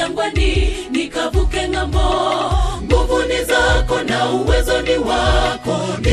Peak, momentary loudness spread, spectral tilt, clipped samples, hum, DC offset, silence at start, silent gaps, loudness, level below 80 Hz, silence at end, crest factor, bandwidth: 0 dBFS; 5 LU; -5 dB/octave; under 0.1%; none; under 0.1%; 0 s; none; -17 LUFS; -20 dBFS; 0 s; 16 dB; 14 kHz